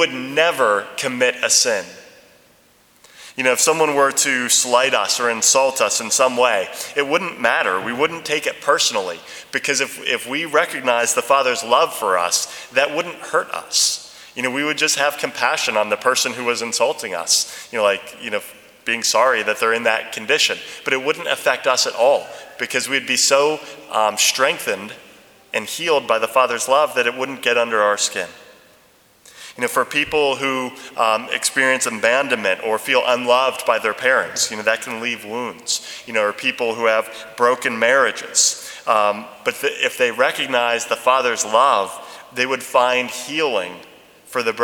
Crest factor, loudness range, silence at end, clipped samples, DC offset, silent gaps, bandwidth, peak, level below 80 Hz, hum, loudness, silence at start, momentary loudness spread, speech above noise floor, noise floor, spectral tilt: 20 dB; 3 LU; 0 s; under 0.1%; under 0.1%; none; over 20 kHz; 0 dBFS; -66 dBFS; none; -18 LUFS; 0 s; 10 LU; 35 dB; -54 dBFS; -0.5 dB/octave